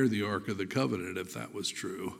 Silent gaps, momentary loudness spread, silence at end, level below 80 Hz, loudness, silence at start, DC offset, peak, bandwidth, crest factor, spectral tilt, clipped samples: none; 7 LU; 0 s; -70 dBFS; -34 LUFS; 0 s; under 0.1%; -16 dBFS; 16 kHz; 18 dB; -5 dB/octave; under 0.1%